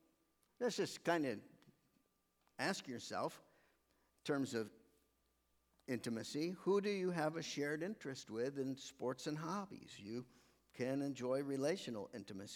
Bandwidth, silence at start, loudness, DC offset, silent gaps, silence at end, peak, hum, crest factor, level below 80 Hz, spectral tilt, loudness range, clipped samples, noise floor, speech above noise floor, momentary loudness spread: 18 kHz; 0.6 s; -43 LUFS; under 0.1%; none; 0 s; -22 dBFS; none; 22 dB; -84 dBFS; -5 dB/octave; 5 LU; under 0.1%; -81 dBFS; 39 dB; 12 LU